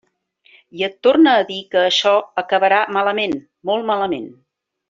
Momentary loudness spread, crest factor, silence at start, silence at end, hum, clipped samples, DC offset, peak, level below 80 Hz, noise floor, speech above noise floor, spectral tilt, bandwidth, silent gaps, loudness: 11 LU; 16 dB; 0.75 s; 0.55 s; none; under 0.1%; under 0.1%; -2 dBFS; -64 dBFS; -57 dBFS; 41 dB; -4 dB/octave; 7.6 kHz; none; -17 LUFS